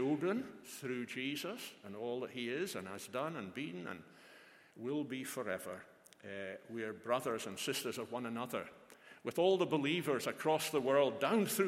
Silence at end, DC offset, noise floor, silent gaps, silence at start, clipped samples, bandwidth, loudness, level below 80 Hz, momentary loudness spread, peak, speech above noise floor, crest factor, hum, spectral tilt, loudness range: 0 s; under 0.1%; -61 dBFS; none; 0 s; under 0.1%; 16.5 kHz; -38 LUFS; -84 dBFS; 15 LU; -18 dBFS; 23 dB; 20 dB; none; -4.5 dB/octave; 9 LU